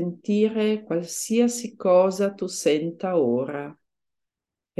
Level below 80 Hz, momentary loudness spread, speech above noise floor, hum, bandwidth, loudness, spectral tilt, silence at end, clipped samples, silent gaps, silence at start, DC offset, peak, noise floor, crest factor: -74 dBFS; 8 LU; 64 dB; none; 12.5 kHz; -23 LUFS; -5 dB/octave; 1.05 s; under 0.1%; none; 0 s; under 0.1%; -8 dBFS; -87 dBFS; 16 dB